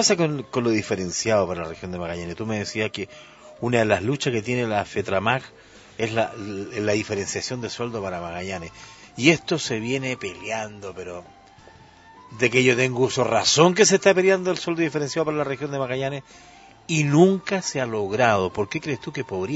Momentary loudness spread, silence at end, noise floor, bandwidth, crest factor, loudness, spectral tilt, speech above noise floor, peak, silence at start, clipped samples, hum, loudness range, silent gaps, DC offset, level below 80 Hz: 14 LU; 0 s; -49 dBFS; 8 kHz; 24 dB; -23 LUFS; -4 dB/octave; 26 dB; 0 dBFS; 0 s; under 0.1%; none; 7 LU; none; under 0.1%; -58 dBFS